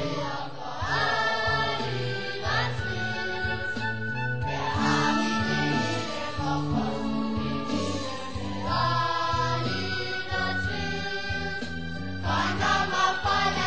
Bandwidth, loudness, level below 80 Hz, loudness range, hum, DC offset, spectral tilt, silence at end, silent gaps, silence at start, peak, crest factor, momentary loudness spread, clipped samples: 8 kHz; -28 LUFS; -44 dBFS; 2 LU; none; 1%; -5 dB/octave; 0 s; none; 0 s; -10 dBFS; 16 dB; 8 LU; under 0.1%